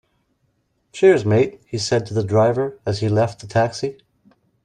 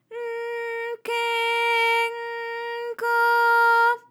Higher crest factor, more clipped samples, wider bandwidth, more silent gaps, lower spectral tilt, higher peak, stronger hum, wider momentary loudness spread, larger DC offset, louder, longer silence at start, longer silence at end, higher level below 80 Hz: about the same, 18 dB vs 14 dB; neither; second, 10 kHz vs 17.5 kHz; neither; first, -6 dB/octave vs 1 dB/octave; first, -2 dBFS vs -10 dBFS; neither; second, 10 LU vs 13 LU; neither; first, -19 LUFS vs -22 LUFS; first, 0.95 s vs 0.1 s; first, 0.7 s vs 0.1 s; first, -56 dBFS vs under -90 dBFS